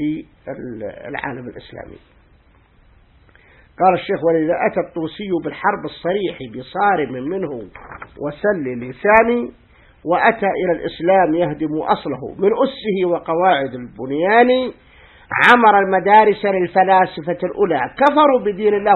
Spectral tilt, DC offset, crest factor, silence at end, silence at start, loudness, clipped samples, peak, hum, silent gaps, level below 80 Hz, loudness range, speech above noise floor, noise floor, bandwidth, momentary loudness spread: -7 dB/octave; under 0.1%; 18 dB; 0 s; 0 s; -17 LUFS; under 0.1%; 0 dBFS; none; none; -52 dBFS; 8 LU; 35 dB; -52 dBFS; 8.8 kHz; 17 LU